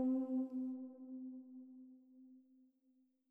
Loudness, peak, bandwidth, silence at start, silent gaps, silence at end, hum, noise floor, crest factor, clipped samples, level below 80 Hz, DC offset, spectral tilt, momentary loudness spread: -44 LUFS; -30 dBFS; 1.6 kHz; 0 s; none; 0.9 s; none; -77 dBFS; 14 dB; under 0.1%; under -90 dBFS; under 0.1%; -9.5 dB/octave; 24 LU